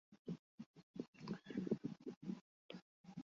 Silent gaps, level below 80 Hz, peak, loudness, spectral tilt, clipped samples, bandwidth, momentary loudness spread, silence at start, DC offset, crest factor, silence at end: 0.19-0.25 s, 0.39-0.58 s, 0.66-0.74 s, 0.83-0.94 s, 1.08-1.13 s, 2.16-2.21 s, 2.41-2.69 s, 2.82-3.04 s; -84 dBFS; -28 dBFS; -50 LUFS; -7 dB/octave; under 0.1%; 7.4 kHz; 14 LU; 0.1 s; under 0.1%; 22 dB; 0 s